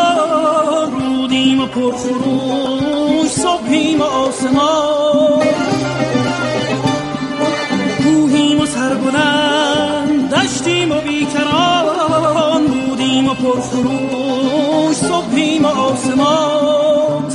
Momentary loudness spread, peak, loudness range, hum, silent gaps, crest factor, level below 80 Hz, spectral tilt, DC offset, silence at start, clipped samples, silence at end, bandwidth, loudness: 4 LU; 0 dBFS; 1 LU; none; none; 14 dB; -48 dBFS; -4.5 dB/octave; under 0.1%; 0 s; under 0.1%; 0 s; 11.5 kHz; -14 LUFS